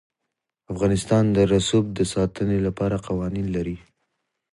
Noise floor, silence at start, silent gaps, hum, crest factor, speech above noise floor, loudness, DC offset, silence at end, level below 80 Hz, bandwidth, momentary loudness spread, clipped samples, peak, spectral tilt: -82 dBFS; 0.7 s; none; none; 18 dB; 60 dB; -23 LUFS; under 0.1%; 0.75 s; -42 dBFS; 11.5 kHz; 9 LU; under 0.1%; -6 dBFS; -6.5 dB/octave